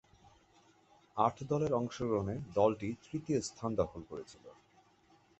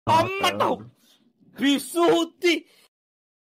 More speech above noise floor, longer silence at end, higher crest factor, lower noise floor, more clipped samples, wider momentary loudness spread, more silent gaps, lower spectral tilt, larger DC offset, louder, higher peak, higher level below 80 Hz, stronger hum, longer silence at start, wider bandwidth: second, 32 dB vs 38 dB; about the same, 0.9 s vs 0.85 s; first, 22 dB vs 16 dB; first, -67 dBFS vs -60 dBFS; neither; first, 16 LU vs 5 LU; neither; first, -6.5 dB/octave vs -4 dB/octave; neither; second, -35 LUFS vs -23 LUFS; second, -16 dBFS vs -10 dBFS; about the same, -62 dBFS vs -64 dBFS; neither; first, 1.15 s vs 0.05 s; second, 8.2 kHz vs 16 kHz